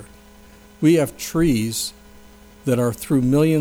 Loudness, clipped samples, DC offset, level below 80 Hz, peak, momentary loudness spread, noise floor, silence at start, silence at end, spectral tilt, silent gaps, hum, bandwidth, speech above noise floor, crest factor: -20 LUFS; under 0.1%; under 0.1%; -42 dBFS; -6 dBFS; 8 LU; -46 dBFS; 0 s; 0 s; -6 dB/octave; none; none; over 20 kHz; 28 dB; 16 dB